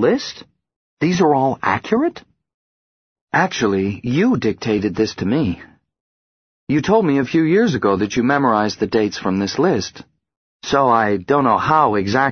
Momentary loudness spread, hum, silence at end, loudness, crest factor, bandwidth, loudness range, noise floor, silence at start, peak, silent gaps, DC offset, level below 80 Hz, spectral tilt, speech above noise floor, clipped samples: 7 LU; none; 0 s; -17 LUFS; 16 dB; 6.6 kHz; 3 LU; under -90 dBFS; 0 s; -2 dBFS; 0.76-0.97 s, 2.54-3.27 s, 6.00-6.67 s, 10.37-10.60 s; under 0.1%; -50 dBFS; -6 dB/octave; over 73 dB; under 0.1%